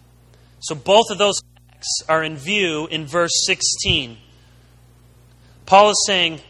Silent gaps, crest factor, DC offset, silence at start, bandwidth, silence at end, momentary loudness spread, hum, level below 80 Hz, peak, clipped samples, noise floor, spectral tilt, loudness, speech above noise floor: none; 20 dB; under 0.1%; 0.6 s; 12 kHz; 0.1 s; 13 LU; 60 Hz at -50 dBFS; -46 dBFS; 0 dBFS; under 0.1%; -50 dBFS; -2 dB/octave; -17 LUFS; 32 dB